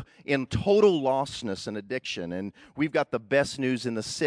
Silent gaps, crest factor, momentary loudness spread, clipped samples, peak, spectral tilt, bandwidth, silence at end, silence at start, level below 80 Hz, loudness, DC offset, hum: none; 18 dB; 12 LU; under 0.1%; -10 dBFS; -5 dB/octave; 11 kHz; 0 s; 0 s; -54 dBFS; -27 LUFS; under 0.1%; none